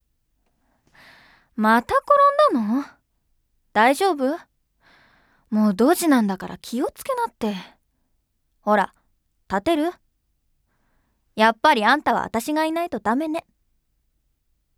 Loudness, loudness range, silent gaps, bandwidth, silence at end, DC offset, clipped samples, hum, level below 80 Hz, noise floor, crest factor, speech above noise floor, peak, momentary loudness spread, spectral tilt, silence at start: -21 LUFS; 7 LU; none; 18 kHz; 1.4 s; under 0.1%; under 0.1%; none; -58 dBFS; -70 dBFS; 20 dB; 50 dB; -2 dBFS; 13 LU; -4.5 dB/octave; 1.55 s